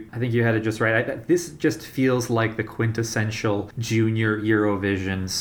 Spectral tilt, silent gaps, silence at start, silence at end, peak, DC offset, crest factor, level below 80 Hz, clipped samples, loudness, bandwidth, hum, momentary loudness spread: -5.5 dB/octave; none; 0 s; 0 s; -6 dBFS; under 0.1%; 16 dB; -56 dBFS; under 0.1%; -23 LUFS; over 20 kHz; none; 4 LU